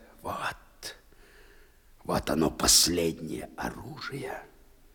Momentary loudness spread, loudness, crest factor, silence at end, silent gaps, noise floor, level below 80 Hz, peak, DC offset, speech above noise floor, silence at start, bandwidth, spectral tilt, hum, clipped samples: 23 LU; -27 LUFS; 22 dB; 0.45 s; none; -56 dBFS; -50 dBFS; -8 dBFS; under 0.1%; 28 dB; 0 s; over 20 kHz; -2.5 dB/octave; none; under 0.1%